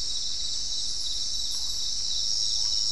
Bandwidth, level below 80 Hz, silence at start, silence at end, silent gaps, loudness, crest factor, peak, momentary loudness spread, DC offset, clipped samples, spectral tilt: 12 kHz; -48 dBFS; 0 s; 0 s; none; -26 LUFS; 14 dB; -14 dBFS; 4 LU; 3%; under 0.1%; 1 dB/octave